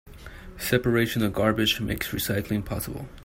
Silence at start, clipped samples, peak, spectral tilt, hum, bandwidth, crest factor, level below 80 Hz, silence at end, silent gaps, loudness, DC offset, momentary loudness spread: 0.05 s; under 0.1%; -8 dBFS; -5 dB/octave; none; 16.5 kHz; 20 dB; -44 dBFS; 0 s; none; -26 LUFS; under 0.1%; 14 LU